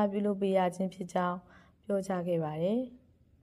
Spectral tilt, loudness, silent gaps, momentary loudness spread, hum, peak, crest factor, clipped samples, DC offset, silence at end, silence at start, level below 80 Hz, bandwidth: -7.5 dB/octave; -32 LUFS; none; 9 LU; none; -16 dBFS; 16 dB; under 0.1%; under 0.1%; 0.45 s; 0 s; -68 dBFS; 12.5 kHz